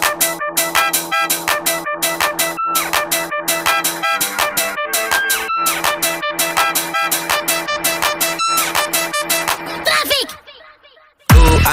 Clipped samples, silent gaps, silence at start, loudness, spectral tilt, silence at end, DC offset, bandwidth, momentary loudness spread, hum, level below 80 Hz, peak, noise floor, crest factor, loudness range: under 0.1%; none; 0 s; -15 LUFS; -2.5 dB/octave; 0 s; under 0.1%; 16.5 kHz; 4 LU; none; -26 dBFS; 0 dBFS; -48 dBFS; 16 dB; 1 LU